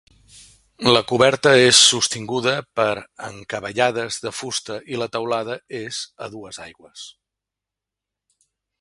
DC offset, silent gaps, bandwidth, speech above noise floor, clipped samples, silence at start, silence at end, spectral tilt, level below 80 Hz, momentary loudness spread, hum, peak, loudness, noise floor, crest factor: under 0.1%; none; 11.5 kHz; 66 dB; under 0.1%; 0.8 s; 1.7 s; -2.5 dB/octave; -58 dBFS; 24 LU; none; 0 dBFS; -18 LUFS; -86 dBFS; 22 dB